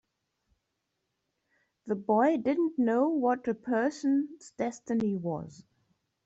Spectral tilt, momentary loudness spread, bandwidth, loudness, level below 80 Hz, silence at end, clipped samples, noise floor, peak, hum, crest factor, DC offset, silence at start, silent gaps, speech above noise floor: -7 dB/octave; 10 LU; 8.2 kHz; -29 LUFS; -72 dBFS; 0.65 s; under 0.1%; -82 dBFS; -14 dBFS; none; 16 dB; under 0.1%; 1.85 s; none; 54 dB